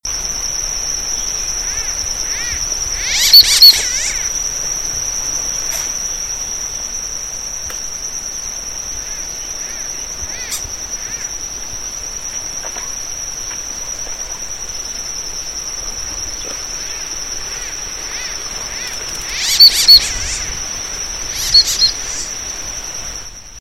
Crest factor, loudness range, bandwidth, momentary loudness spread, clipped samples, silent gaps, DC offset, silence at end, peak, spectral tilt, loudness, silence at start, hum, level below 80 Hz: 18 dB; 12 LU; over 20 kHz; 17 LU; 0.5%; none; under 0.1%; 0 s; 0 dBFS; 1.5 dB/octave; -15 LUFS; 0.05 s; none; -36 dBFS